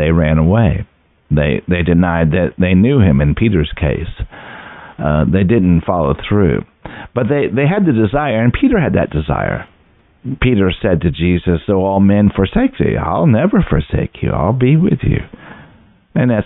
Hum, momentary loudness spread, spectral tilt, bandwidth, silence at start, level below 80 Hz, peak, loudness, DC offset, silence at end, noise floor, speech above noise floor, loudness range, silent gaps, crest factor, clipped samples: none; 12 LU; -13 dB/octave; 4 kHz; 0 s; -28 dBFS; 0 dBFS; -14 LUFS; under 0.1%; 0 s; -51 dBFS; 38 dB; 2 LU; none; 12 dB; under 0.1%